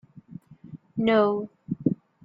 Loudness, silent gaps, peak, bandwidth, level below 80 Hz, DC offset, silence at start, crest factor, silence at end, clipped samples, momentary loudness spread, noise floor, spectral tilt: -26 LUFS; none; -8 dBFS; 5.2 kHz; -64 dBFS; under 0.1%; 0.3 s; 20 dB; 0.3 s; under 0.1%; 25 LU; -46 dBFS; -9 dB/octave